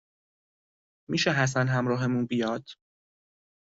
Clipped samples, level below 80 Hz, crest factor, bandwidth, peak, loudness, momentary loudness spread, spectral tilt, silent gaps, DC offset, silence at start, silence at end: under 0.1%; -66 dBFS; 18 dB; 8 kHz; -10 dBFS; -27 LUFS; 8 LU; -4.5 dB/octave; none; under 0.1%; 1.1 s; 0.95 s